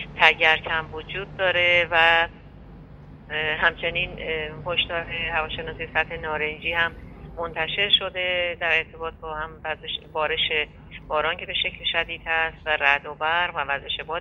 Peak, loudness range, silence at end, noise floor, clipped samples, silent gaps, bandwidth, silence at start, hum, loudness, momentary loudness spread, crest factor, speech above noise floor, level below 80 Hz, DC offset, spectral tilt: 0 dBFS; 4 LU; 0 s; -44 dBFS; under 0.1%; none; 11.5 kHz; 0 s; none; -23 LUFS; 14 LU; 24 dB; 19 dB; -46 dBFS; under 0.1%; -4.5 dB/octave